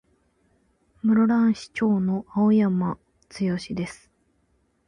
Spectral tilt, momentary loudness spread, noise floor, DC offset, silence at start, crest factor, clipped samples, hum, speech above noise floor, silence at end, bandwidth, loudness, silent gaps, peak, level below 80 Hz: -7.5 dB/octave; 12 LU; -67 dBFS; under 0.1%; 1.05 s; 12 dB; under 0.1%; none; 45 dB; 0.95 s; 10 kHz; -23 LUFS; none; -12 dBFS; -58 dBFS